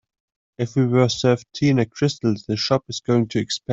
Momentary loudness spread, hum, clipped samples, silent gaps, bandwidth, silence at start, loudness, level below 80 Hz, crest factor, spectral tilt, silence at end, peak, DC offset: 6 LU; none; under 0.1%; none; 8 kHz; 0.6 s; -21 LUFS; -56 dBFS; 16 dB; -6 dB/octave; 0 s; -4 dBFS; under 0.1%